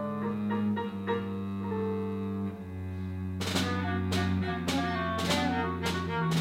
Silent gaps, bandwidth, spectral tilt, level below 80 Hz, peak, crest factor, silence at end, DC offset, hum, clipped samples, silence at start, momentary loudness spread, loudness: none; 16 kHz; -5.5 dB/octave; -54 dBFS; -14 dBFS; 16 dB; 0 s; under 0.1%; none; under 0.1%; 0 s; 7 LU; -32 LUFS